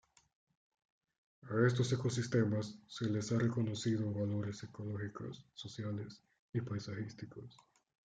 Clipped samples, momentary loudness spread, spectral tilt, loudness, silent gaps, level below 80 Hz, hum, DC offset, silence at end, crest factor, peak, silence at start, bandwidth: under 0.1%; 15 LU; -6.5 dB/octave; -38 LUFS; 6.39-6.53 s; -74 dBFS; none; under 0.1%; 0.65 s; 20 dB; -18 dBFS; 1.45 s; 9.2 kHz